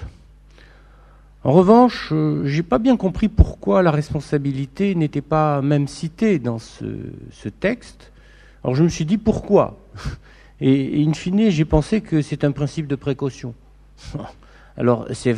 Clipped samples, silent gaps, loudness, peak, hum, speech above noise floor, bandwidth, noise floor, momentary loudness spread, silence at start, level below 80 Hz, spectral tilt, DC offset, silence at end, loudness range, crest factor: under 0.1%; none; -19 LUFS; 0 dBFS; none; 28 dB; 10.5 kHz; -47 dBFS; 16 LU; 0 s; -34 dBFS; -7.5 dB/octave; under 0.1%; 0 s; 6 LU; 20 dB